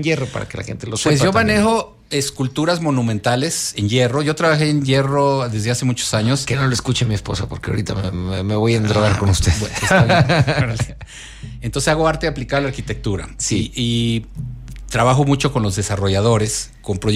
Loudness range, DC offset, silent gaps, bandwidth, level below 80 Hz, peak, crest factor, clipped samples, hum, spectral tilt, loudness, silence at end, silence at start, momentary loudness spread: 4 LU; under 0.1%; none; 15 kHz; -36 dBFS; -2 dBFS; 14 dB; under 0.1%; none; -5 dB/octave; -18 LUFS; 0 s; 0 s; 10 LU